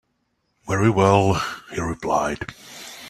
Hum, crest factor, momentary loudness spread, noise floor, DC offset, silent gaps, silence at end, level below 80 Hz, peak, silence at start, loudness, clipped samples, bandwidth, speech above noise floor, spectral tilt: none; 20 dB; 17 LU; -71 dBFS; under 0.1%; none; 0 s; -48 dBFS; -2 dBFS; 0.65 s; -21 LUFS; under 0.1%; 14 kHz; 51 dB; -6 dB/octave